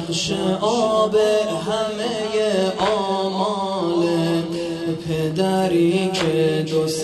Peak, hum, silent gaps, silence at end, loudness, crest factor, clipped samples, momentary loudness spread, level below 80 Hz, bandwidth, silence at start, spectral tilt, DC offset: -6 dBFS; none; none; 0 s; -20 LUFS; 14 dB; under 0.1%; 6 LU; -54 dBFS; 12 kHz; 0 s; -5 dB/octave; under 0.1%